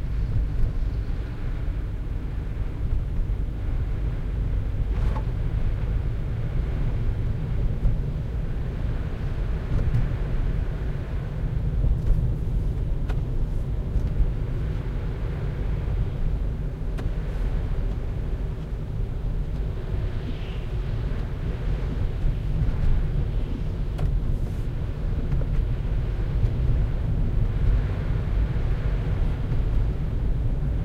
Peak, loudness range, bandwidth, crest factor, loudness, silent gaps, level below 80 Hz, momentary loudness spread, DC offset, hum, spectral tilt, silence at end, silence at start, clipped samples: -10 dBFS; 4 LU; 5.4 kHz; 16 dB; -29 LUFS; none; -26 dBFS; 5 LU; under 0.1%; none; -9 dB/octave; 0 s; 0 s; under 0.1%